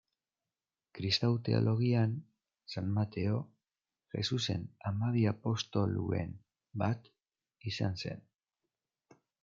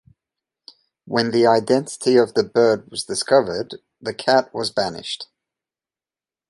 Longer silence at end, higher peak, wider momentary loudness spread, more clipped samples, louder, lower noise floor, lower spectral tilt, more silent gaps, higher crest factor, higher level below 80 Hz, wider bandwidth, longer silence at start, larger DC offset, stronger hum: about the same, 1.25 s vs 1.25 s; second, -16 dBFS vs -2 dBFS; about the same, 14 LU vs 14 LU; neither; second, -34 LUFS vs -19 LUFS; about the same, under -90 dBFS vs under -90 dBFS; first, -6.5 dB/octave vs -4 dB/octave; neither; about the same, 20 dB vs 18 dB; second, -70 dBFS vs -62 dBFS; second, 7.4 kHz vs 11.5 kHz; about the same, 0.95 s vs 1.05 s; neither; neither